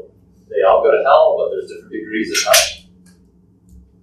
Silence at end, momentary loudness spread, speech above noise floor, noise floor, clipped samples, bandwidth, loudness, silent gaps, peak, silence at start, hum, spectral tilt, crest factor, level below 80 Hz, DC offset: 1.25 s; 17 LU; 37 dB; -51 dBFS; under 0.1%; 16 kHz; -14 LUFS; none; 0 dBFS; 0.5 s; none; -1 dB/octave; 18 dB; -50 dBFS; under 0.1%